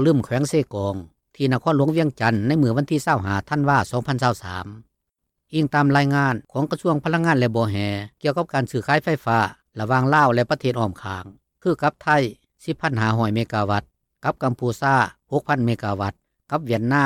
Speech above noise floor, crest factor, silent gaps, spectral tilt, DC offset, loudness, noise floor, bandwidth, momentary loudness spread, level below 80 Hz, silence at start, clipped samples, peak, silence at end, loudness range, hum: 58 dB; 16 dB; none; -6.5 dB/octave; under 0.1%; -21 LUFS; -79 dBFS; 15.5 kHz; 10 LU; -54 dBFS; 0 s; under 0.1%; -6 dBFS; 0 s; 2 LU; none